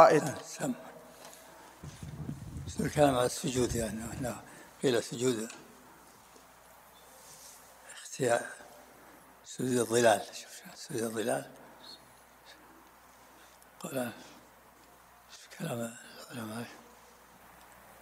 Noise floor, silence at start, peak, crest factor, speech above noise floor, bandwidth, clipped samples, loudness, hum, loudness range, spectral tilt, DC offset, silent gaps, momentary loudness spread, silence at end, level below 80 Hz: -58 dBFS; 0 s; -6 dBFS; 28 dB; 28 dB; 16 kHz; under 0.1%; -33 LUFS; none; 12 LU; -4.5 dB/octave; under 0.1%; none; 27 LU; 0.1 s; -60 dBFS